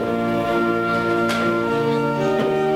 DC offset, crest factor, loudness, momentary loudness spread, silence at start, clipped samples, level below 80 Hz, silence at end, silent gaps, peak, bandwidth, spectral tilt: under 0.1%; 12 dB; -20 LUFS; 1 LU; 0 s; under 0.1%; -50 dBFS; 0 s; none; -8 dBFS; 16.5 kHz; -6.5 dB/octave